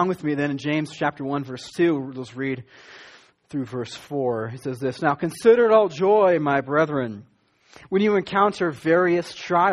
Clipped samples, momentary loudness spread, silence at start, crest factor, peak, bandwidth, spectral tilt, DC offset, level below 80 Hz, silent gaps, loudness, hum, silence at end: under 0.1%; 13 LU; 0 s; 18 dB; -4 dBFS; 12.5 kHz; -6.5 dB/octave; under 0.1%; -64 dBFS; none; -22 LUFS; none; 0 s